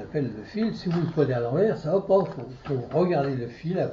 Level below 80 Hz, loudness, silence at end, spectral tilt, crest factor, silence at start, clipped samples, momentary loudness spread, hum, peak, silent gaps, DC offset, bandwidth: -56 dBFS; -26 LUFS; 0 s; -9 dB/octave; 16 dB; 0 s; under 0.1%; 8 LU; none; -10 dBFS; none; under 0.1%; 7.2 kHz